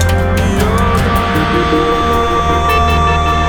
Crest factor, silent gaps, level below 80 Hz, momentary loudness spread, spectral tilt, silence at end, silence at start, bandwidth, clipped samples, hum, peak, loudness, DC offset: 10 dB; none; -20 dBFS; 2 LU; -5.5 dB/octave; 0 s; 0 s; over 20 kHz; under 0.1%; none; 0 dBFS; -12 LUFS; under 0.1%